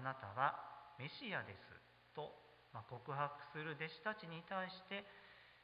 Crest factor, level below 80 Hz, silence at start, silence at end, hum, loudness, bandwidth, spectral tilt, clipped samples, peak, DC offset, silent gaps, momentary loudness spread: 26 dB; -80 dBFS; 0 s; 0 s; none; -47 LUFS; 5 kHz; -3 dB/octave; under 0.1%; -24 dBFS; under 0.1%; none; 19 LU